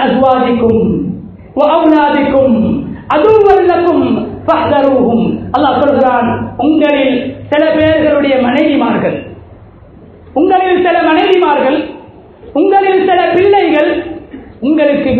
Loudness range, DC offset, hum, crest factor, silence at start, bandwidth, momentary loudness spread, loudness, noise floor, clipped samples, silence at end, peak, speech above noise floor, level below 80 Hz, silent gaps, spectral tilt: 2 LU; under 0.1%; none; 10 dB; 0 s; 5.2 kHz; 9 LU; -10 LUFS; -36 dBFS; 0.3%; 0 s; 0 dBFS; 27 dB; -38 dBFS; none; -8.5 dB/octave